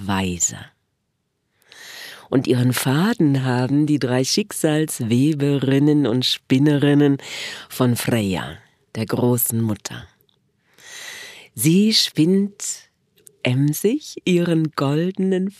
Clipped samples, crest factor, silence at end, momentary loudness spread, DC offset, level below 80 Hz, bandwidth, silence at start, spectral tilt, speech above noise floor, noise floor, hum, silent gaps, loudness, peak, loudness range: under 0.1%; 18 dB; 0.1 s; 18 LU; under 0.1%; -58 dBFS; 15.5 kHz; 0 s; -5 dB/octave; 54 dB; -72 dBFS; none; none; -19 LUFS; -2 dBFS; 5 LU